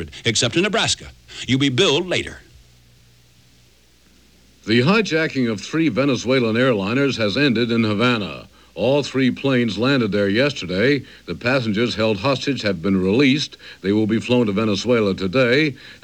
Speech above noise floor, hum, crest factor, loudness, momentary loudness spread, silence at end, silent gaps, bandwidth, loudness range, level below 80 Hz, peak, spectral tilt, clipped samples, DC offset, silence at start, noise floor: 35 dB; none; 16 dB; -19 LUFS; 7 LU; 0.1 s; none; 11.5 kHz; 5 LU; -52 dBFS; -4 dBFS; -5 dB/octave; under 0.1%; 0.1%; 0 s; -54 dBFS